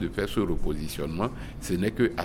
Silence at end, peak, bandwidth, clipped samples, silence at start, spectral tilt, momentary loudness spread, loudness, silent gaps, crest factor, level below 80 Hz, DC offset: 0 s; -10 dBFS; 16.5 kHz; under 0.1%; 0 s; -6 dB/octave; 7 LU; -30 LUFS; none; 16 dB; -36 dBFS; under 0.1%